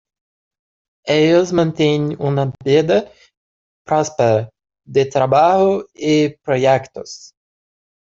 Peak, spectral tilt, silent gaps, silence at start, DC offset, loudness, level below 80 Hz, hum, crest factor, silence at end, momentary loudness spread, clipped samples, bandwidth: -2 dBFS; -6 dB/octave; 3.37-3.85 s; 1.05 s; under 0.1%; -16 LUFS; -56 dBFS; none; 14 dB; 0.75 s; 11 LU; under 0.1%; 7.8 kHz